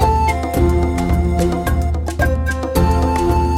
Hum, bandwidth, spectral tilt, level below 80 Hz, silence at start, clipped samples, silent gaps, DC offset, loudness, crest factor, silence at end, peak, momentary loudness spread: none; 16 kHz; -7 dB/octave; -20 dBFS; 0 s; under 0.1%; none; under 0.1%; -17 LUFS; 14 dB; 0 s; -2 dBFS; 3 LU